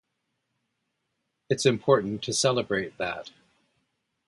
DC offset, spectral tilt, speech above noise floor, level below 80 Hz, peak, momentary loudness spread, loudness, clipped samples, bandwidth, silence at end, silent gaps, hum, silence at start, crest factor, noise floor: under 0.1%; -4 dB/octave; 54 dB; -64 dBFS; -6 dBFS; 9 LU; -26 LUFS; under 0.1%; 11.5 kHz; 1 s; none; none; 1.5 s; 24 dB; -79 dBFS